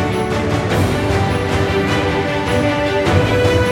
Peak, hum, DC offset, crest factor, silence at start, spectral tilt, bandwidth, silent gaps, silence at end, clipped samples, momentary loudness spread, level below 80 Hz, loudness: 0 dBFS; none; under 0.1%; 14 dB; 0 s; -6 dB/octave; 17.5 kHz; none; 0 s; under 0.1%; 4 LU; -30 dBFS; -16 LUFS